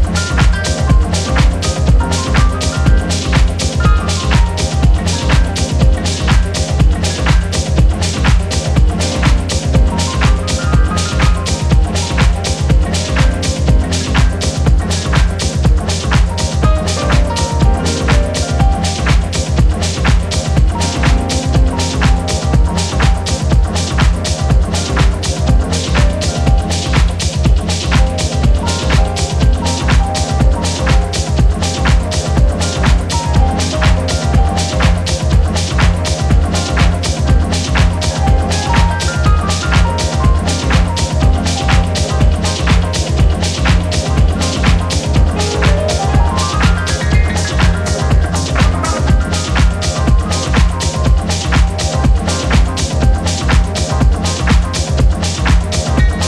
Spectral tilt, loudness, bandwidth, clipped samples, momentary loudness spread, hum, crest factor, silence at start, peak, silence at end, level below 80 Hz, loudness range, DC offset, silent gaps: -5 dB/octave; -14 LUFS; 12 kHz; under 0.1%; 2 LU; none; 12 dB; 0 s; 0 dBFS; 0 s; -14 dBFS; 1 LU; under 0.1%; none